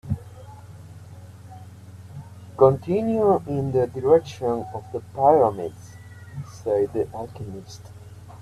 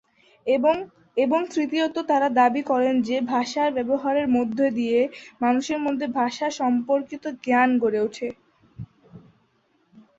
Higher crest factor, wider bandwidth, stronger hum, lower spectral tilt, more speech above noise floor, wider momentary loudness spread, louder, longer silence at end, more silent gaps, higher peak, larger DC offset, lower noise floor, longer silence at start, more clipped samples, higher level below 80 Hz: about the same, 20 dB vs 16 dB; first, 13 kHz vs 7.8 kHz; neither; first, -8 dB/octave vs -5 dB/octave; second, 20 dB vs 43 dB; first, 25 LU vs 11 LU; about the same, -22 LUFS vs -23 LUFS; second, 0 s vs 0.2 s; neither; first, -4 dBFS vs -8 dBFS; neither; second, -42 dBFS vs -66 dBFS; second, 0.05 s vs 0.45 s; neither; first, -54 dBFS vs -64 dBFS